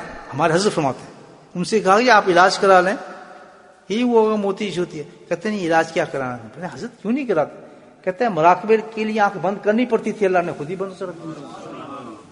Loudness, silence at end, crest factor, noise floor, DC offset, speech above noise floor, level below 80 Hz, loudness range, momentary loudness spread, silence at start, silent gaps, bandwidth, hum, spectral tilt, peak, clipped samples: -19 LUFS; 0.1 s; 20 dB; -46 dBFS; under 0.1%; 27 dB; -60 dBFS; 6 LU; 20 LU; 0 s; none; 11 kHz; none; -5 dB/octave; 0 dBFS; under 0.1%